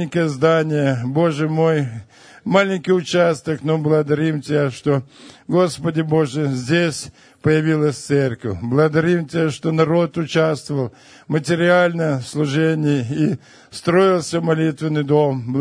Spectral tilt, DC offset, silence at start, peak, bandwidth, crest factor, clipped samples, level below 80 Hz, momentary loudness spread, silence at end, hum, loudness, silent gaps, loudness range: -6.5 dB/octave; under 0.1%; 0 s; 0 dBFS; 10.5 kHz; 18 dB; under 0.1%; -56 dBFS; 7 LU; 0 s; none; -18 LUFS; none; 1 LU